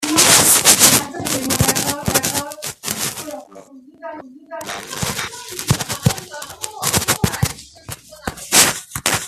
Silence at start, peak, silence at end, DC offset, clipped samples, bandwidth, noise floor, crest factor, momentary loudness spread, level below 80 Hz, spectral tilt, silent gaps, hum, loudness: 0 s; 0 dBFS; 0 s; under 0.1%; under 0.1%; over 20 kHz; -41 dBFS; 18 dB; 24 LU; -42 dBFS; -2 dB/octave; none; none; -15 LUFS